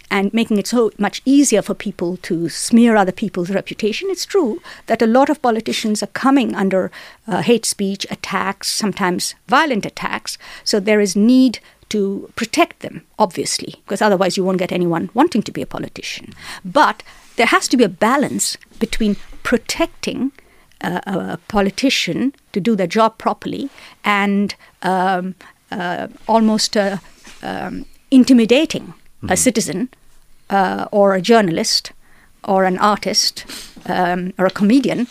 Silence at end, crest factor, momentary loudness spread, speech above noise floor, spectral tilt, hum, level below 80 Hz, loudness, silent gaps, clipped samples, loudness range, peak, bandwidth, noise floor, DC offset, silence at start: 0.05 s; 16 dB; 13 LU; 29 dB; -4 dB/octave; none; -44 dBFS; -17 LUFS; none; under 0.1%; 3 LU; 0 dBFS; 15.5 kHz; -46 dBFS; under 0.1%; 0.1 s